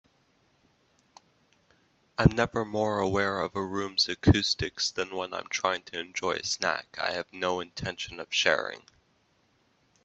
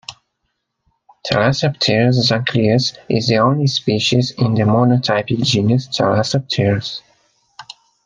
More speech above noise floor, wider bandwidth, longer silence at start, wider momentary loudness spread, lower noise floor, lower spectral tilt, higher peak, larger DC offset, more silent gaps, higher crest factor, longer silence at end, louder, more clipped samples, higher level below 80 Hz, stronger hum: second, 40 dB vs 57 dB; second, 8.4 kHz vs 9.6 kHz; first, 2.2 s vs 0.1 s; first, 11 LU vs 7 LU; about the same, -69 dBFS vs -72 dBFS; about the same, -4.5 dB/octave vs -5.5 dB/octave; second, -6 dBFS vs 0 dBFS; neither; neither; first, 26 dB vs 16 dB; first, 1.25 s vs 0.45 s; second, -28 LUFS vs -16 LUFS; neither; about the same, -48 dBFS vs -52 dBFS; neither